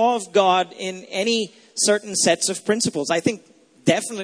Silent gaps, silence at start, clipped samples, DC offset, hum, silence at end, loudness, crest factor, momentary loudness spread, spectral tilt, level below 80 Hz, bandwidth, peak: none; 0 s; under 0.1%; under 0.1%; none; 0 s; -21 LUFS; 20 dB; 10 LU; -3 dB/octave; -66 dBFS; 11 kHz; -2 dBFS